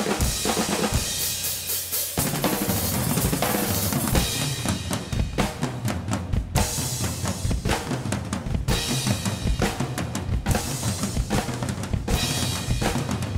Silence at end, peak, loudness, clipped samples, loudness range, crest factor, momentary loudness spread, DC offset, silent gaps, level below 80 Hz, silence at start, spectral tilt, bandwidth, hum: 0 s; -6 dBFS; -25 LUFS; under 0.1%; 3 LU; 20 dB; 5 LU; under 0.1%; none; -34 dBFS; 0 s; -4 dB/octave; 16.5 kHz; none